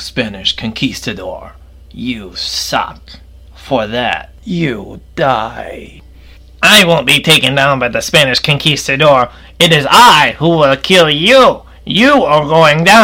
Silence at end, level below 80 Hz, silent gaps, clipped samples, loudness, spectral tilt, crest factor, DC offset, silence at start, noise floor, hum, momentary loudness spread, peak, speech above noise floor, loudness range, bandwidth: 0 s; -38 dBFS; none; 0.5%; -9 LUFS; -3.5 dB/octave; 12 dB; under 0.1%; 0 s; -37 dBFS; none; 16 LU; 0 dBFS; 26 dB; 11 LU; 19 kHz